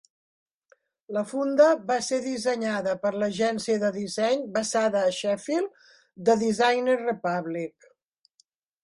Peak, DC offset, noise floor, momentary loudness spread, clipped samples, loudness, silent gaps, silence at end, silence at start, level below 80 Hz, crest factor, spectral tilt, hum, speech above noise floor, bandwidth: -8 dBFS; under 0.1%; -68 dBFS; 9 LU; under 0.1%; -25 LUFS; none; 1.15 s; 1.1 s; -70 dBFS; 18 dB; -4 dB/octave; none; 43 dB; 11.5 kHz